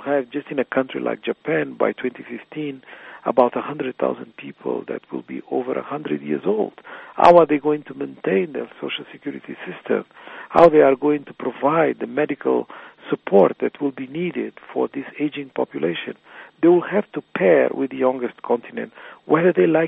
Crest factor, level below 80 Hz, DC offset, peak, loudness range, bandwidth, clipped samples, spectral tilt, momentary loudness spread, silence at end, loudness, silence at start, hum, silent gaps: 20 dB; -62 dBFS; under 0.1%; 0 dBFS; 6 LU; 6.2 kHz; under 0.1%; -5 dB/octave; 17 LU; 0 s; -21 LUFS; 0 s; none; none